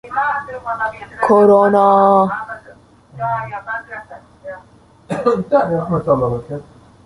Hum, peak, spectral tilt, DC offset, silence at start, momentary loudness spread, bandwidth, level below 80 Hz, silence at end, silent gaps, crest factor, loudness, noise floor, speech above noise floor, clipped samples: none; -2 dBFS; -8 dB/octave; under 0.1%; 0.05 s; 22 LU; 11.5 kHz; -50 dBFS; 0.45 s; none; 16 dB; -16 LUFS; -47 dBFS; 32 dB; under 0.1%